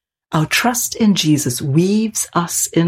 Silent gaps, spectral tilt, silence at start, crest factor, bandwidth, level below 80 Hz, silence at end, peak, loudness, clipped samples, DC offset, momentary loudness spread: none; -4 dB/octave; 0.3 s; 14 dB; 16.5 kHz; -52 dBFS; 0 s; -2 dBFS; -16 LUFS; under 0.1%; under 0.1%; 4 LU